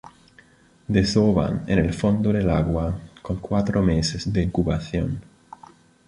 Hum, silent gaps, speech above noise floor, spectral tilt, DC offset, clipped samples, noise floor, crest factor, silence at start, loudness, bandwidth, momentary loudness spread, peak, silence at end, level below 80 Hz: none; none; 33 dB; -6.5 dB/octave; under 0.1%; under 0.1%; -54 dBFS; 18 dB; 0.05 s; -23 LUFS; 11 kHz; 11 LU; -4 dBFS; 0.85 s; -36 dBFS